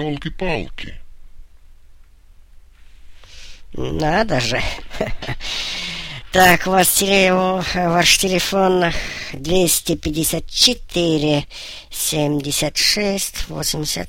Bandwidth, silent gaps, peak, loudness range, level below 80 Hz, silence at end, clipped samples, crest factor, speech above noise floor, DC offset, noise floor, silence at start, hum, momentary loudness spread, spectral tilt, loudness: 16.5 kHz; none; 0 dBFS; 11 LU; -34 dBFS; 0 s; under 0.1%; 18 dB; 27 dB; under 0.1%; -45 dBFS; 0 s; none; 14 LU; -3 dB/octave; -17 LUFS